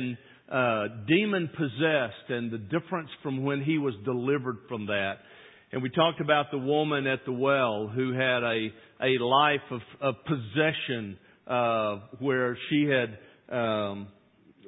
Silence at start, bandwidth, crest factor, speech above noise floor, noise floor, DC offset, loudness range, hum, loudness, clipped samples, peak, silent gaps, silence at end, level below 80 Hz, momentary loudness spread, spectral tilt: 0 s; 4 kHz; 20 dB; 31 dB; -59 dBFS; under 0.1%; 3 LU; none; -28 LUFS; under 0.1%; -8 dBFS; none; 0 s; -66 dBFS; 10 LU; -10 dB/octave